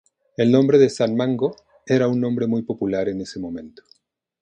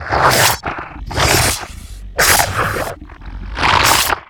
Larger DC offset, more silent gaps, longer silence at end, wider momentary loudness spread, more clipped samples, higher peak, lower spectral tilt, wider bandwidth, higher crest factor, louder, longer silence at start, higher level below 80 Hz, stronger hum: neither; neither; first, 0.7 s vs 0.05 s; second, 15 LU vs 21 LU; neither; about the same, -2 dBFS vs 0 dBFS; first, -7 dB/octave vs -2 dB/octave; second, 9.4 kHz vs over 20 kHz; about the same, 18 dB vs 16 dB; second, -20 LUFS vs -13 LUFS; first, 0.4 s vs 0 s; second, -58 dBFS vs -30 dBFS; neither